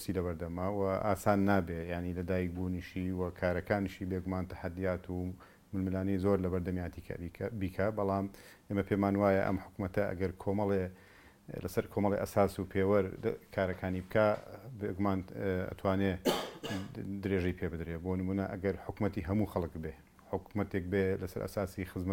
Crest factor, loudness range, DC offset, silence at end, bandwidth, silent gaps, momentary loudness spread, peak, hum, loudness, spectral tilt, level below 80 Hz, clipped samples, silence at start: 22 dB; 3 LU; under 0.1%; 0 s; 17 kHz; none; 10 LU; -12 dBFS; none; -35 LUFS; -7 dB/octave; -56 dBFS; under 0.1%; 0 s